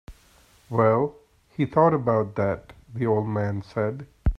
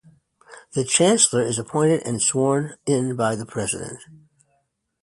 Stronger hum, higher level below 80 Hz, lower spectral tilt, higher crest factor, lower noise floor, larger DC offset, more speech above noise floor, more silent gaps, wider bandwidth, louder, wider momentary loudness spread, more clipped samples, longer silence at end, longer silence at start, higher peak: neither; first, -38 dBFS vs -60 dBFS; first, -9.5 dB/octave vs -4 dB/octave; about the same, 20 dB vs 20 dB; second, -57 dBFS vs -70 dBFS; neither; second, 34 dB vs 49 dB; neither; second, 9.6 kHz vs 11.5 kHz; second, -24 LUFS vs -21 LUFS; about the same, 10 LU vs 12 LU; neither; second, 0 s vs 0.9 s; second, 0.1 s vs 0.5 s; about the same, -4 dBFS vs -4 dBFS